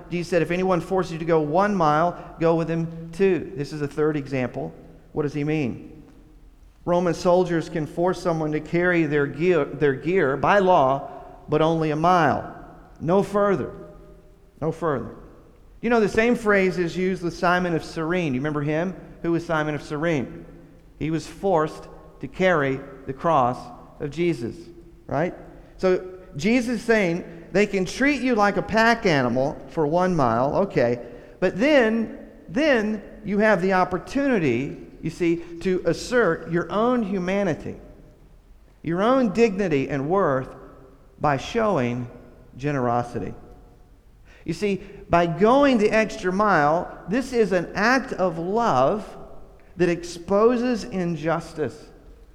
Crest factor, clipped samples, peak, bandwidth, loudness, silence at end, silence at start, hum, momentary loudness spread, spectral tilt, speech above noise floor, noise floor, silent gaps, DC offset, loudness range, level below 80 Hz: 18 dB; under 0.1%; -4 dBFS; 13 kHz; -23 LUFS; 0.2 s; 0 s; none; 13 LU; -6.5 dB/octave; 28 dB; -50 dBFS; none; under 0.1%; 5 LU; -48 dBFS